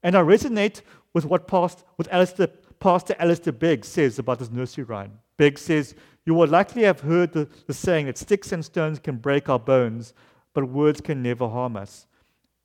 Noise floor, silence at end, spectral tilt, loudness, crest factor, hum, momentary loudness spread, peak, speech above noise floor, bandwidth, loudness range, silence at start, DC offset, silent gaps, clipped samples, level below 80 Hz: -67 dBFS; 0.8 s; -6.5 dB/octave; -23 LUFS; 18 dB; none; 12 LU; -4 dBFS; 46 dB; 16 kHz; 3 LU; 0.05 s; under 0.1%; none; under 0.1%; -56 dBFS